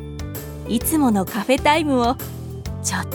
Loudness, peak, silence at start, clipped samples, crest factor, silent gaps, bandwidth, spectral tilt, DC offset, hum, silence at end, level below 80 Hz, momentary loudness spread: -20 LUFS; -2 dBFS; 0 s; under 0.1%; 20 dB; none; over 20 kHz; -4.5 dB/octave; under 0.1%; none; 0 s; -38 dBFS; 14 LU